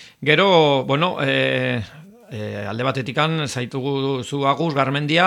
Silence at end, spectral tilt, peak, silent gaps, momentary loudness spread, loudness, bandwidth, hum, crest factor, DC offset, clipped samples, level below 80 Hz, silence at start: 0 s; -5.5 dB/octave; -2 dBFS; none; 13 LU; -20 LUFS; 13 kHz; none; 18 dB; under 0.1%; under 0.1%; -62 dBFS; 0 s